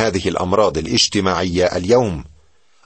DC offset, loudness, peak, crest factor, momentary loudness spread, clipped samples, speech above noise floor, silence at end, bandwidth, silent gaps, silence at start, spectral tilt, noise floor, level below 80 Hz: 0.2%; -17 LUFS; -2 dBFS; 16 dB; 5 LU; under 0.1%; 39 dB; 0.6 s; 8.8 kHz; none; 0 s; -4 dB/octave; -56 dBFS; -40 dBFS